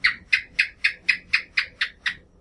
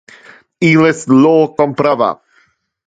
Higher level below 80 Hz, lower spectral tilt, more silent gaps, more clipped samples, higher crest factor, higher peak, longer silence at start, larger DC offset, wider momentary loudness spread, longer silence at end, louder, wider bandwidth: about the same, -56 dBFS vs -56 dBFS; second, 0 dB/octave vs -6.5 dB/octave; neither; neither; first, 22 dB vs 14 dB; second, -4 dBFS vs 0 dBFS; second, 0.05 s vs 0.6 s; neither; about the same, 7 LU vs 7 LU; second, 0.25 s vs 0.75 s; second, -23 LUFS vs -12 LUFS; first, 11.5 kHz vs 9.2 kHz